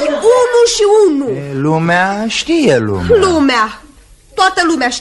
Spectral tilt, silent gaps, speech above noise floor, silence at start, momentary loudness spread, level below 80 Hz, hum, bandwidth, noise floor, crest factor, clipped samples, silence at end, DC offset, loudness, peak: -4.5 dB/octave; none; 29 dB; 0 s; 8 LU; -40 dBFS; none; 11.5 kHz; -41 dBFS; 12 dB; under 0.1%; 0 s; under 0.1%; -11 LUFS; 0 dBFS